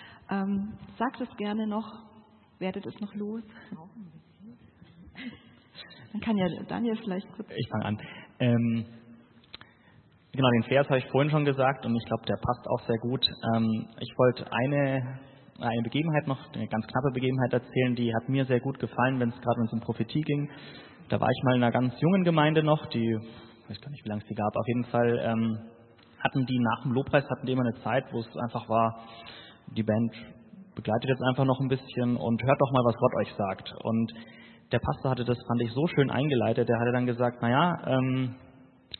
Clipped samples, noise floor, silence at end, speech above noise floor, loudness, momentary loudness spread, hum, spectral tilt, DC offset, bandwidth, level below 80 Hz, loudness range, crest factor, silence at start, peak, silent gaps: under 0.1%; -59 dBFS; 0.05 s; 31 dB; -28 LUFS; 18 LU; none; -11 dB/octave; under 0.1%; 4.4 kHz; -62 dBFS; 8 LU; 22 dB; 0 s; -8 dBFS; none